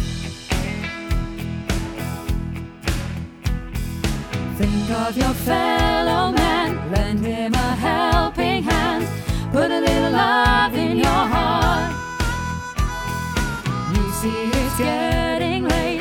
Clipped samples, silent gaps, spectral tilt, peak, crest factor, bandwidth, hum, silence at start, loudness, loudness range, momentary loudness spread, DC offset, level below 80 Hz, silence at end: under 0.1%; none; -5 dB/octave; -4 dBFS; 16 dB; 19 kHz; none; 0 s; -21 LUFS; 8 LU; 9 LU; under 0.1%; -28 dBFS; 0 s